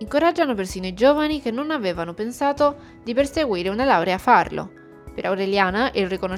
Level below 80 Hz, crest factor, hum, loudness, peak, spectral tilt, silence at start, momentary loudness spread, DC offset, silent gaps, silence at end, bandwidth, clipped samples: -46 dBFS; 18 dB; none; -21 LUFS; -2 dBFS; -5 dB/octave; 0 s; 11 LU; under 0.1%; none; 0 s; 15.5 kHz; under 0.1%